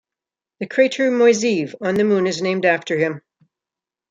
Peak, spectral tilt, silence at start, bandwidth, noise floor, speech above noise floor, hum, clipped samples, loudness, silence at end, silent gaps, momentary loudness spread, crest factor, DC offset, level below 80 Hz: -2 dBFS; -5 dB/octave; 0.6 s; 9.2 kHz; -88 dBFS; 70 dB; none; under 0.1%; -18 LUFS; 0.9 s; none; 9 LU; 16 dB; under 0.1%; -66 dBFS